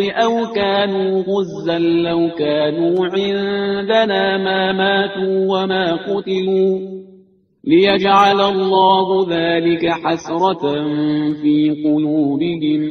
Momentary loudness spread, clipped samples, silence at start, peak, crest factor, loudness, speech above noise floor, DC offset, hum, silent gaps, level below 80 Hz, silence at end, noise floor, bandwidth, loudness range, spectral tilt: 7 LU; under 0.1%; 0 s; 0 dBFS; 16 dB; -16 LUFS; 34 dB; under 0.1%; none; none; -56 dBFS; 0 s; -50 dBFS; 6.6 kHz; 3 LU; -6.5 dB/octave